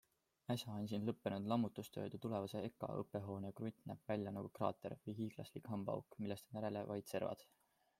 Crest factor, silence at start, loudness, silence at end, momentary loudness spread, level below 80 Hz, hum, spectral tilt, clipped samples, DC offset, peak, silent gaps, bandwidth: 22 dB; 0.5 s; -46 LUFS; 0.55 s; 7 LU; -80 dBFS; none; -7 dB/octave; under 0.1%; under 0.1%; -24 dBFS; none; 16 kHz